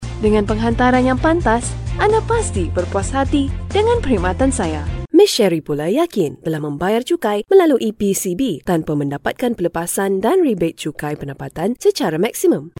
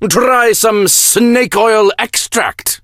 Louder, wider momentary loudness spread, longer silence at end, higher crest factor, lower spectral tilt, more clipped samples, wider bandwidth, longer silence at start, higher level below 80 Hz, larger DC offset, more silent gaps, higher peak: second, -17 LUFS vs -10 LUFS; about the same, 9 LU vs 7 LU; about the same, 0.1 s vs 0.05 s; first, 16 dB vs 10 dB; first, -5.5 dB/octave vs -2 dB/octave; neither; about the same, 17 kHz vs 17.5 kHz; about the same, 0 s vs 0 s; first, -30 dBFS vs -46 dBFS; neither; neither; about the same, -2 dBFS vs 0 dBFS